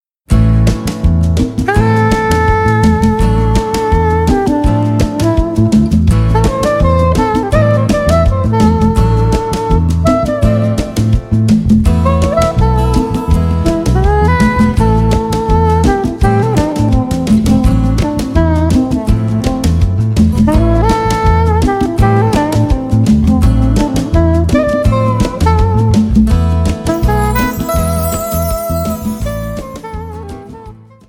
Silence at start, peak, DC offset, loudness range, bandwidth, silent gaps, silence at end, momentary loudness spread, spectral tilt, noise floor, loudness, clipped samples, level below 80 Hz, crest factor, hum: 0.3 s; 0 dBFS; under 0.1%; 1 LU; 17 kHz; none; 0.35 s; 5 LU; -7 dB/octave; -34 dBFS; -12 LUFS; under 0.1%; -18 dBFS; 10 dB; none